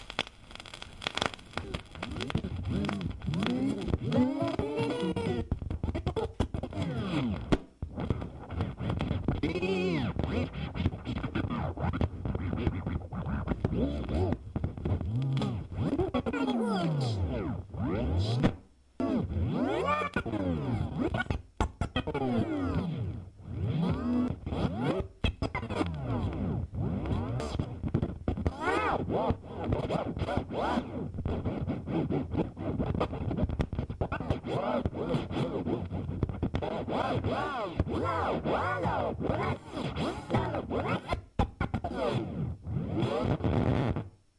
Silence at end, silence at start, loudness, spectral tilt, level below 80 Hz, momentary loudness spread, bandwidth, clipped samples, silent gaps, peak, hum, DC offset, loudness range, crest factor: 0.3 s; 0 s; -33 LUFS; -7.5 dB/octave; -44 dBFS; 6 LU; 11.5 kHz; under 0.1%; none; -12 dBFS; none; under 0.1%; 2 LU; 20 dB